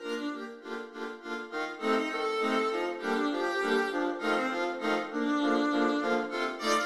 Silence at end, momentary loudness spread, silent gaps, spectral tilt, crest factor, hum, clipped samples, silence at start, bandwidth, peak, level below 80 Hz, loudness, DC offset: 0 s; 11 LU; none; -3.5 dB/octave; 16 dB; none; under 0.1%; 0 s; 14 kHz; -14 dBFS; -78 dBFS; -31 LUFS; under 0.1%